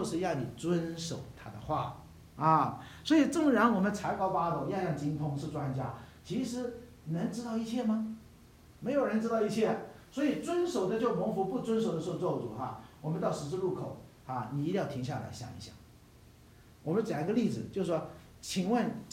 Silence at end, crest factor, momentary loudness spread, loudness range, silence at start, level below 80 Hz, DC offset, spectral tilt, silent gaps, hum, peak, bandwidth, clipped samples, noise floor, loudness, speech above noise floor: 0 s; 20 dB; 15 LU; 7 LU; 0 s; -62 dBFS; under 0.1%; -6.5 dB/octave; none; none; -12 dBFS; 16 kHz; under 0.1%; -57 dBFS; -33 LUFS; 25 dB